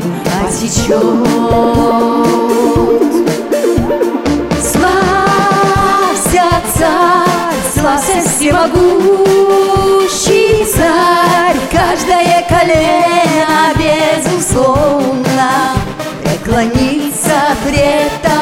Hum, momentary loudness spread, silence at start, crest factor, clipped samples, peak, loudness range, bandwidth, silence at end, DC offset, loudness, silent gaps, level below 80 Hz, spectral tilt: none; 5 LU; 0 s; 10 dB; under 0.1%; 0 dBFS; 3 LU; 17 kHz; 0 s; under 0.1%; -10 LUFS; none; -28 dBFS; -4.5 dB/octave